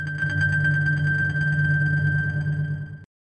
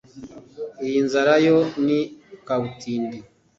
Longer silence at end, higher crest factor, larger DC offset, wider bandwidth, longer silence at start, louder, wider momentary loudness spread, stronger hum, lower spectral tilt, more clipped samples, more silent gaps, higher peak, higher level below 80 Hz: about the same, 0.3 s vs 0.35 s; second, 12 dB vs 18 dB; neither; about the same, 8.4 kHz vs 7.8 kHz; second, 0 s vs 0.15 s; about the same, -22 LUFS vs -21 LUFS; second, 7 LU vs 24 LU; neither; first, -7.5 dB/octave vs -6 dB/octave; neither; neither; second, -12 dBFS vs -4 dBFS; first, -50 dBFS vs -62 dBFS